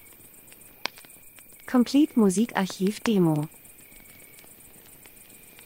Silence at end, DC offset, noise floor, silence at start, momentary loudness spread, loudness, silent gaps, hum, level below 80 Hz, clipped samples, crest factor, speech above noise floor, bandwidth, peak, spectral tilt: 2.2 s; under 0.1%; -50 dBFS; 0.95 s; 26 LU; -25 LUFS; none; none; -64 dBFS; under 0.1%; 20 dB; 27 dB; 16 kHz; -6 dBFS; -5.5 dB/octave